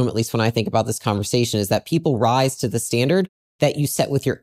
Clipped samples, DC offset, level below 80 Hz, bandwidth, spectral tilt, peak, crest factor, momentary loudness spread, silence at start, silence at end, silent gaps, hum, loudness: under 0.1%; under 0.1%; -56 dBFS; 16 kHz; -5 dB/octave; -2 dBFS; 18 dB; 4 LU; 0 s; 0.05 s; 3.29-3.59 s; none; -20 LUFS